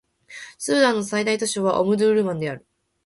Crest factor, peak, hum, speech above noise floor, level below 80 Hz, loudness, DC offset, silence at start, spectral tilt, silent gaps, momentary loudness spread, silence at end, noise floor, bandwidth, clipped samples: 18 dB; -4 dBFS; none; 22 dB; -64 dBFS; -21 LUFS; under 0.1%; 0.3 s; -4 dB/octave; none; 20 LU; 0.5 s; -42 dBFS; 11.5 kHz; under 0.1%